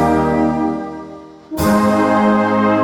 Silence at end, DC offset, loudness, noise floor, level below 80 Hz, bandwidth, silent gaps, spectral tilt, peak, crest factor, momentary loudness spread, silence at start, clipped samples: 0 s; under 0.1%; -15 LUFS; -35 dBFS; -38 dBFS; 16 kHz; none; -6.5 dB/octave; -4 dBFS; 12 dB; 15 LU; 0 s; under 0.1%